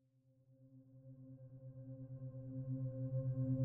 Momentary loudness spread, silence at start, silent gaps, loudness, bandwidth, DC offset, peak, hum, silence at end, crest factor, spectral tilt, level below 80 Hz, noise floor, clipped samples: 21 LU; 0.5 s; none; -46 LUFS; 1.7 kHz; under 0.1%; -30 dBFS; none; 0 s; 16 dB; -13 dB/octave; -72 dBFS; -73 dBFS; under 0.1%